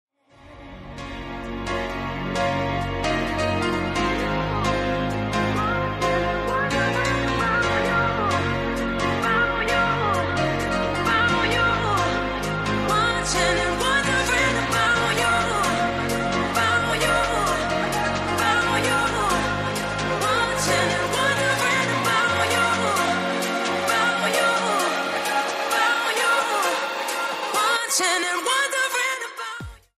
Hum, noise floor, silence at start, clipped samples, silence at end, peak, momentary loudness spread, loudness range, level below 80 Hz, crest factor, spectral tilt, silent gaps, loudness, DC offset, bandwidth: none; -48 dBFS; 0.45 s; under 0.1%; 0.2 s; -8 dBFS; 5 LU; 3 LU; -40 dBFS; 14 dB; -3.5 dB/octave; none; -22 LUFS; under 0.1%; 15.5 kHz